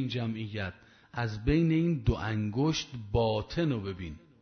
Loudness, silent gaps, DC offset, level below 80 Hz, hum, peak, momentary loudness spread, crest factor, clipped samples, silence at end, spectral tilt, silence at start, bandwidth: -31 LUFS; none; under 0.1%; -44 dBFS; none; -12 dBFS; 12 LU; 18 dB; under 0.1%; 0.25 s; -6.5 dB/octave; 0 s; 6.6 kHz